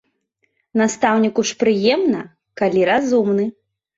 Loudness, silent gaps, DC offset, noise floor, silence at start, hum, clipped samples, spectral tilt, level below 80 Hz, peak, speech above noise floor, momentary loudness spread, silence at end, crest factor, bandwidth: -18 LUFS; none; under 0.1%; -68 dBFS; 0.75 s; none; under 0.1%; -4.5 dB/octave; -62 dBFS; -4 dBFS; 52 dB; 9 LU; 0.45 s; 16 dB; 8 kHz